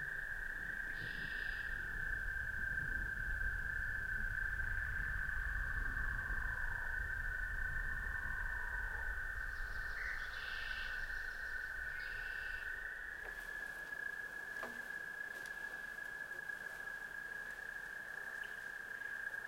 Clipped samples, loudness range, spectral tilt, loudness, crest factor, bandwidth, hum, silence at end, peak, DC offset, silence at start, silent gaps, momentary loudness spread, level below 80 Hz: under 0.1%; 5 LU; -3.5 dB/octave; -42 LUFS; 14 dB; 16.5 kHz; none; 0 s; -28 dBFS; under 0.1%; 0 s; none; 5 LU; -48 dBFS